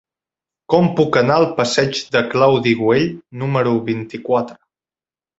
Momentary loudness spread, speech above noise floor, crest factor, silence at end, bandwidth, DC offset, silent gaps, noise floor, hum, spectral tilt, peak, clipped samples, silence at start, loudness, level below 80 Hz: 9 LU; over 74 dB; 18 dB; 0.85 s; 8 kHz; under 0.1%; none; under -90 dBFS; none; -6 dB/octave; 0 dBFS; under 0.1%; 0.7 s; -17 LUFS; -54 dBFS